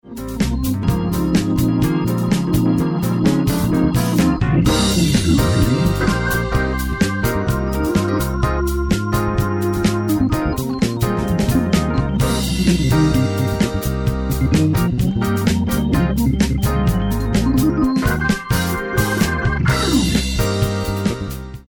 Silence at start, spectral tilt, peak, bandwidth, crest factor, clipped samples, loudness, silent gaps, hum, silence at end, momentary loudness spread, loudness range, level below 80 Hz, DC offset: 0.05 s; -6 dB/octave; -2 dBFS; 19 kHz; 14 dB; under 0.1%; -18 LUFS; none; none; 0.1 s; 5 LU; 3 LU; -26 dBFS; under 0.1%